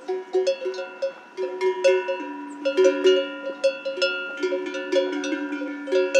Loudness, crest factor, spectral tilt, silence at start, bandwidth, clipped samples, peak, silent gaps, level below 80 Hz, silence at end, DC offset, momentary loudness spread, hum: -24 LUFS; 18 dB; -2 dB/octave; 0 s; 9.2 kHz; under 0.1%; -6 dBFS; none; -82 dBFS; 0 s; under 0.1%; 11 LU; none